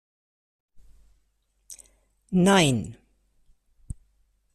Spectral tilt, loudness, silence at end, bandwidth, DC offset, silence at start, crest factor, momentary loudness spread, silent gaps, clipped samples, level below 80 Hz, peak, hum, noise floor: -5 dB/octave; -22 LUFS; 1.6 s; 13.5 kHz; under 0.1%; 1.7 s; 22 dB; 27 LU; none; under 0.1%; -54 dBFS; -6 dBFS; none; -70 dBFS